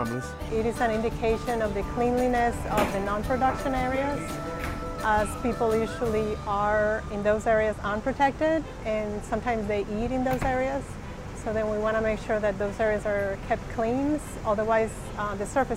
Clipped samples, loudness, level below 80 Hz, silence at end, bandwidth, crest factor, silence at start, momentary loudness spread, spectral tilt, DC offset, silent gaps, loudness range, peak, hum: under 0.1%; -27 LUFS; -40 dBFS; 0 s; 16 kHz; 18 dB; 0 s; 7 LU; -6 dB/octave; under 0.1%; none; 2 LU; -10 dBFS; none